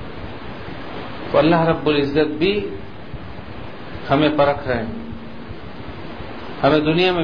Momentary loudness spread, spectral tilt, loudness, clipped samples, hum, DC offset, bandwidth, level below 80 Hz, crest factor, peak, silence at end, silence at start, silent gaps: 19 LU; -8 dB/octave; -18 LUFS; under 0.1%; none; 2%; 5.2 kHz; -42 dBFS; 18 dB; -2 dBFS; 0 s; 0 s; none